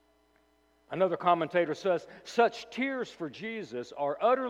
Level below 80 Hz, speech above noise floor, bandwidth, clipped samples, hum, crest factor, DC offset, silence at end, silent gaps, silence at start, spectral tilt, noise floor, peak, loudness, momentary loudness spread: -76 dBFS; 38 dB; 11 kHz; under 0.1%; none; 20 dB; under 0.1%; 0 s; none; 0.9 s; -5.5 dB/octave; -68 dBFS; -12 dBFS; -31 LUFS; 11 LU